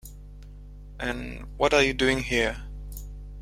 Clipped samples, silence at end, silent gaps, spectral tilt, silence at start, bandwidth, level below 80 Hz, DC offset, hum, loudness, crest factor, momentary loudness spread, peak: under 0.1%; 0 s; none; -4 dB/octave; 0.05 s; 16.5 kHz; -40 dBFS; under 0.1%; 50 Hz at -40 dBFS; -25 LUFS; 22 dB; 26 LU; -6 dBFS